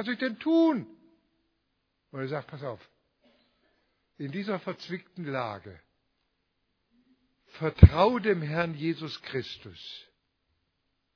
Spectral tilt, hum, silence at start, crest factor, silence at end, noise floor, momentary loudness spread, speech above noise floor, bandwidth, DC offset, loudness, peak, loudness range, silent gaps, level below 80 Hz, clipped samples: -6.5 dB/octave; none; 0 s; 30 dB; 1.15 s; -78 dBFS; 24 LU; 51 dB; 5.4 kHz; under 0.1%; -27 LUFS; 0 dBFS; 14 LU; none; -38 dBFS; under 0.1%